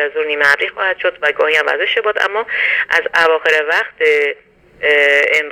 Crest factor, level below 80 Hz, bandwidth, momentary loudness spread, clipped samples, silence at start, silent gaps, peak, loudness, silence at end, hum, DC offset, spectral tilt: 14 dB; -58 dBFS; 16.5 kHz; 6 LU; under 0.1%; 0 s; none; 0 dBFS; -13 LUFS; 0 s; none; under 0.1%; -1 dB/octave